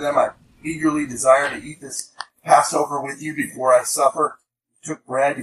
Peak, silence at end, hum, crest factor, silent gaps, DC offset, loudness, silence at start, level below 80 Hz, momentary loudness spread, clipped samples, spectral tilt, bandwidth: 0 dBFS; 0 s; none; 20 dB; none; under 0.1%; -20 LUFS; 0 s; -60 dBFS; 17 LU; under 0.1%; -3.5 dB/octave; 14.5 kHz